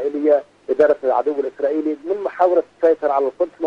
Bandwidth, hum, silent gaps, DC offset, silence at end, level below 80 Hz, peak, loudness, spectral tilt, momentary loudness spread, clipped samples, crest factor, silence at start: 6.8 kHz; none; none; under 0.1%; 0 s; -66 dBFS; -4 dBFS; -19 LUFS; -6.5 dB/octave; 7 LU; under 0.1%; 14 dB; 0 s